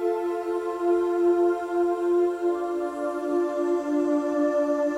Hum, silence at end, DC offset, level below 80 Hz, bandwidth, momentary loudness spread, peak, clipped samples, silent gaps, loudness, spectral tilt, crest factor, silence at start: none; 0 s; under 0.1%; -66 dBFS; 10.5 kHz; 6 LU; -14 dBFS; under 0.1%; none; -25 LUFS; -5 dB/octave; 10 dB; 0 s